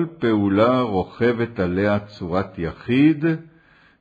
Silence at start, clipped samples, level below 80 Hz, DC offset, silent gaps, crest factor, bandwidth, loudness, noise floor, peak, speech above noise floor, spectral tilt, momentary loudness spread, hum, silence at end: 0 s; under 0.1%; -50 dBFS; under 0.1%; none; 16 dB; 6.8 kHz; -21 LUFS; -54 dBFS; -4 dBFS; 34 dB; -9 dB/octave; 8 LU; none; 0.6 s